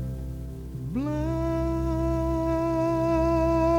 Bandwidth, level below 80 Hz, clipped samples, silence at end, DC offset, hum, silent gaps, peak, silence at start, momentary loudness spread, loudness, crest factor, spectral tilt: 16.5 kHz; -34 dBFS; under 0.1%; 0 s; under 0.1%; 60 Hz at -45 dBFS; none; -12 dBFS; 0 s; 13 LU; -27 LUFS; 14 dB; -8.5 dB/octave